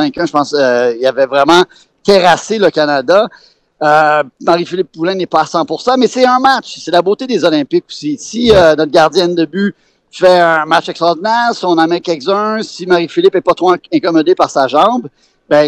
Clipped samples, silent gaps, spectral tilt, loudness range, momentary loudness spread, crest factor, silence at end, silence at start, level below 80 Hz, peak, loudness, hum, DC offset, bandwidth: 0.1%; none; -4.5 dB/octave; 2 LU; 8 LU; 12 dB; 0 s; 0 s; -44 dBFS; 0 dBFS; -11 LUFS; none; under 0.1%; 12 kHz